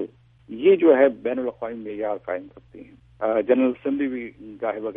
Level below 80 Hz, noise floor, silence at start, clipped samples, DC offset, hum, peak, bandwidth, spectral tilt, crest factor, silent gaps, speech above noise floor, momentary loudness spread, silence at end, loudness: -60 dBFS; -46 dBFS; 0 s; under 0.1%; under 0.1%; none; -4 dBFS; 3.7 kHz; -9.5 dB/octave; 20 dB; none; 24 dB; 16 LU; 0 s; -22 LUFS